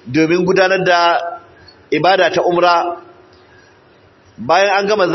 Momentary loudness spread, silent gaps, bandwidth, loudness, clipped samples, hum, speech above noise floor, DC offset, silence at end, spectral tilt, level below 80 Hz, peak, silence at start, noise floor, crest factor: 14 LU; none; 6.2 kHz; -13 LUFS; under 0.1%; none; 35 dB; under 0.1%; 0 s; -5 dB/octave; -58 dBFS; -2 dBFS; 0.05 s; -48 dBFS; 14 dB